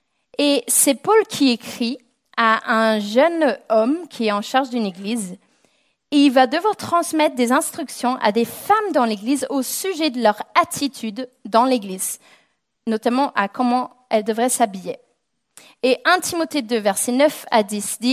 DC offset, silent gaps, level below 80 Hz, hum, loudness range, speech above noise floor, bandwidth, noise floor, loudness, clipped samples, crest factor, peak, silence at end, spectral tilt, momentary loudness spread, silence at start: under 0.1%; none; -70 dBFS; none; 3 LU; 51 dB; 16 kHz; -70 dBFS; -19 LUFS; under 0.1%; 18 dB; -2 dBFS; 0 s; -3 dB/octave; 10 LU; 0.4 s